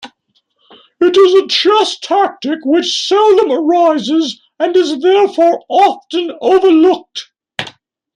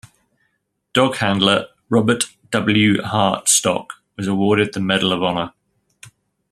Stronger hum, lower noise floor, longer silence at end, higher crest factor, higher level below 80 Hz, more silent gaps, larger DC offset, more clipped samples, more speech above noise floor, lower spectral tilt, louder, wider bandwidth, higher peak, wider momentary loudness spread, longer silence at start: neither; second, -61 dBFS vs -70 dBFS; second, 0.45 s vs 1.05 s; second, 12 dB vs 20 dB; second, -62 dBFS vs -56 dBFS; neither; neither; neither; about the same, 50 dB vs 53 dB; about the same, -3 dB/octave vs -3.5 dB/octave; first, -12 LUFS vs -18 LUFS; second, 10 kHz vs 14.5 kHz; about the same, 0 dBFS vs 0 dBFS; first, 12 LU vs 9 LU; second, 0 s vs 0.95 s